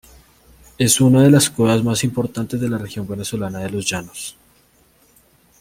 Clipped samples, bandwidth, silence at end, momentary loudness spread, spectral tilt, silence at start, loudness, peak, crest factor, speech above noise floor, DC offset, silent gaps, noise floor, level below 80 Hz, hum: under 0.1%; 16.5 kHz; 1.3 s; 15 LU; -5 dB/octave; 0.8 s; -17 LUFS; -2 dBFS; 18 dB; 38 dB; under 0.1%; none; -56 dBFS; -50 dBFS; none